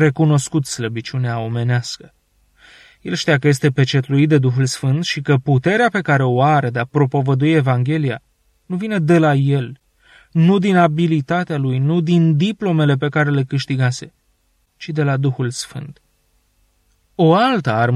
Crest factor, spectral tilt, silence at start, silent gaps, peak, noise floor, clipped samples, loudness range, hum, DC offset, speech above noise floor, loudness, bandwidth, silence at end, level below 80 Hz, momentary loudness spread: 16 dB; -6.5 dB/octave; 0 s; none; -2 dBFS; -62 dBFS; under 0.1%; 5 LU; none; under 0.1%; 46 dB; -17 LUFS; 12 kHz; 0 s; -56 dBFS; 11 LU